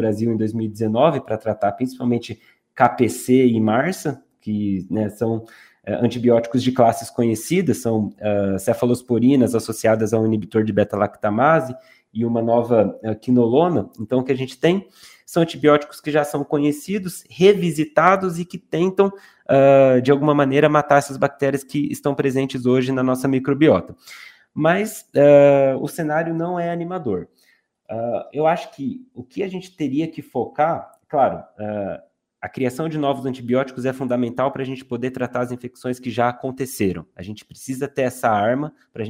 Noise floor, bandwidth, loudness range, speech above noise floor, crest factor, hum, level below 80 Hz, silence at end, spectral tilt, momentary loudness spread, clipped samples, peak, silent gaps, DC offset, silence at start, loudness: -61 dBFS; 16 kHz; 7 LU; 42 dB; 20 dB; none; -62 dBFS; 0 s; -6.5 dB/octave; 13 LU; under 0.1%; 0 dBFS; none; under 0.1%; 0 s; -20 LUFS